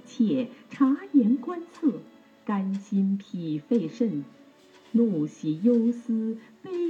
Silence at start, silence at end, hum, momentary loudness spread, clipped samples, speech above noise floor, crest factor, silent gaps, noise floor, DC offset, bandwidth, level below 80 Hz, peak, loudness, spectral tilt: 0.05 s; 0 s; none; 13 LU; under 0.1%; 29 dB; 16 dB; none; -54 dBFS; under 0.1%; 7.4 kHz; -86 dBFS; -10 dBFS; -27 LUFS; -8.5 dB/octave